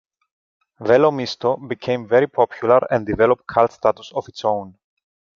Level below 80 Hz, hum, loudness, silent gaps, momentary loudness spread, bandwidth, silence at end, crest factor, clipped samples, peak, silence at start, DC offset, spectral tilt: -52 dBFS; none; -19 LUFS; none; 10 LU; 7.2 kHz; 0.65 s; 18 dB; under 0.1%; -2 dBFS; 0.8 s; under 0.1%; -6.5 dB/octave